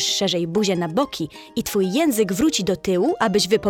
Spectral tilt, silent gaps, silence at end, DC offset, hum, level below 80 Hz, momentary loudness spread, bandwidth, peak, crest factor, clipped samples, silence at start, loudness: -4 dB/octave; none; 0 s; under 0.1%; none; -50 dBFS; 6 LU; 18 kHz; -6 dBFS; 16 dB; under 0.1%; 0 s; -21 LUFS